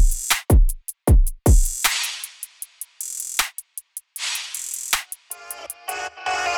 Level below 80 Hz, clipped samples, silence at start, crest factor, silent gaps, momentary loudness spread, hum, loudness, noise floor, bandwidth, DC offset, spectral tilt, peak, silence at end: -22 dBFS; under 0.1%; 0 s; 18 dB; none; 16 LU; none; -22 LUFS; -39 dBFS; 19.5 kHz; under 0.1%; -3 dB/octave; -4 dBFS; 0 s